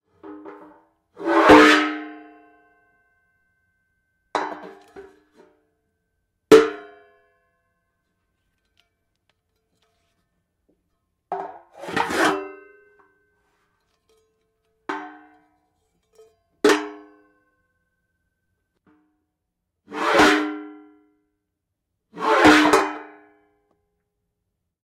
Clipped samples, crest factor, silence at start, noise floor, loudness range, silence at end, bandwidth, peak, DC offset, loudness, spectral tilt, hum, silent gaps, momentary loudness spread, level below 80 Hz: under 0.1%; 24 dB; 0.25 s; -80 dBFS; 18 LU; 1.8 s; 16 kHz; -2 dBFS; under 0.1%; -18 LUFS; -3.5 dB/octave; none; none; 26 LU; -56 dBFS